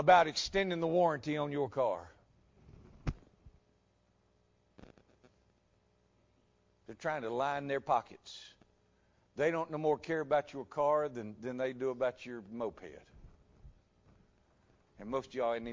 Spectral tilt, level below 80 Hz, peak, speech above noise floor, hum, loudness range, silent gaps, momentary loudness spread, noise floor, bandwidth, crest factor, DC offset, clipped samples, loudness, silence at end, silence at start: -5 dB/octave; -60 dBFS; -12 dBFS; 39 dB; none; 14 LU; none; 18 LU; -73 dBFS; 7.6 kHz; 24 dB; under 0.1%; under 0.1%; -35 LUFS; 0 s; 0 s